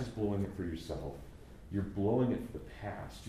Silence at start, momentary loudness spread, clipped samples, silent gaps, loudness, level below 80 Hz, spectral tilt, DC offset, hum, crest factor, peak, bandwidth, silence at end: 0 s; 15 LU; under 0.1%; none; -37 LUFS; -52 dBFS; -8 dB/octave; under 0.1%; none; 16 dB; -20 dBFS; 15 kHz; 0 s